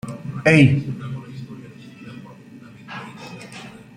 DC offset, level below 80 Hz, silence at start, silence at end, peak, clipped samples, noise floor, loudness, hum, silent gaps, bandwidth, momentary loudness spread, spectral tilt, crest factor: under 0.1%; -54 dBFS; 0.05 s; 0.2 s; -2 dBFS; under 0.1%; -42 dBFS; -18 LUFS; none; none; 10 kHz; 26 LU; -7 dB/octave; 20 dB